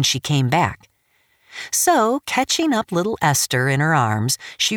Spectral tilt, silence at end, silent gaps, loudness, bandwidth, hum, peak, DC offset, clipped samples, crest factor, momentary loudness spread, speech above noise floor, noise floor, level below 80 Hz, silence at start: -3.5 dB/octave; 0 s; none; -19 LUFS; 19 kHz; none; -4 dBFS; under 0.1%; under 0.1%; 16 dB; 6 LU; 44 dB; -63 dBFS; -56 dBFS; 0 s